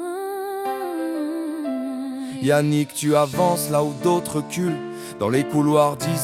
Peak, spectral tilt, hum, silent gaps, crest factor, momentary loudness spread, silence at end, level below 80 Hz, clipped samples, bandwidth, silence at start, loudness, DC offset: -4 dBFS; -5.5 dB/octave; none; none; 18 dB; 10 LU; 0 s; -60 dBFS; under 0.1%; 16.5 kHz; 0 s; -22 LUFS; under 0.1%